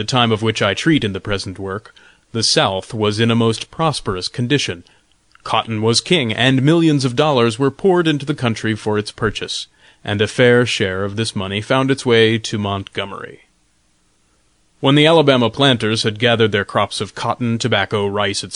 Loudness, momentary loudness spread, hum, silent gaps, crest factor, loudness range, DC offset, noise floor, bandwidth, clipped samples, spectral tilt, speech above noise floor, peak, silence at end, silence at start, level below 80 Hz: -16 LUFS; 11 LU; none; none; 16 dB; 4 LU; under 0.1%; -60 dBFS; 11 kHz; under 0.1%; -5 dB/octave; 44 dB; -2 dBFS; 0 s; 0 s; -48 dBFS